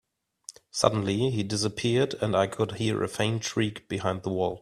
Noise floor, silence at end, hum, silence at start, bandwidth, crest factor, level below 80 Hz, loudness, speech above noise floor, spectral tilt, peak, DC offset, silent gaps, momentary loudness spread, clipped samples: -50 dBFS; 0 s; none; 0.5 s; 13 kHz; 22 dB; -60 dBFS; -27 LUFS; 23 dB; -5 dB/octave; -4 dBFS; under 0.1%; none; 6 LU; under 0.1%